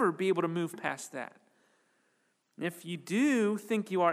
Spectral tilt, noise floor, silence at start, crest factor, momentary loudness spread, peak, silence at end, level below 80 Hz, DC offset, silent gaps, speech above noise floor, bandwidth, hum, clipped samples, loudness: -5.5 dB/octave; -75 dBFS; 0 s; 18 dB; 14 LU; -14 dBFS; 0 s; -90 dBFS; under 0.1%; none; 44 dB; 15.5 kHz; none; under 0.1%; -32 LUFS